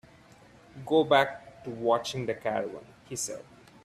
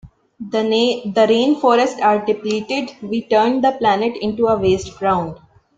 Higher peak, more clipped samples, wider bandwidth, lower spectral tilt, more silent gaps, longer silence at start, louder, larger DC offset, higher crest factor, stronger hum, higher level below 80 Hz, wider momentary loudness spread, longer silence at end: second, -8 dBFS vs -2 dBFS; neither; first, 15 kHz vs 9 kHz; second, -4 dB/octave vs -5.5 dB/octave; neither; first, 0.75 s vs 0.05 s; second, -29 LUFS vs -17 LUFS; neither; first, 22 dB vs 16 dB; neither; second, -66 dBFS vs -50 dBFS; first, 20 LU vs 9 LU; about the same, 0.45 s vs 0.45 s